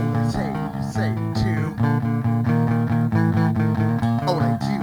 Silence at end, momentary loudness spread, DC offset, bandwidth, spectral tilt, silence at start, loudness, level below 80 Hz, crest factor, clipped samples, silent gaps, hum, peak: 0 s; 5 LU; under 0.1%; 12.5 kHz; -8 dB/octave; 0 s; -21 LUFS; -44 dBFS; 14 dB; under 0.1%; none; none; -6 dBFS